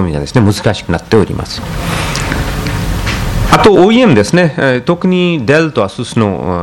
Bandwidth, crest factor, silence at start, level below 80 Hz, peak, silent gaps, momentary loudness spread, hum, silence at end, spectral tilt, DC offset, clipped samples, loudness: 17.5 kHz; 10 dB; 0 s; -24 dBFS; 0 dBFS; none; 10 LU; none; 0 s; -6 dB/octave; under 0.1%; 0.8%; -11 LUFS